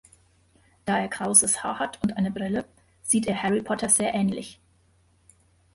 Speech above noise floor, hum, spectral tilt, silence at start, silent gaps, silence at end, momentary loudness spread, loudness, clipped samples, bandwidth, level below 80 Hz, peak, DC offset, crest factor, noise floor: 38 dB; none; -3.5 dB/octave; 0.85 s; none; 1.2 s; 14 LU; -24 LUFS; under 0.1%; 12 kHz; -58 dBFS; -4 dBFS; under 0.1%; 22 dB; -63 dBFS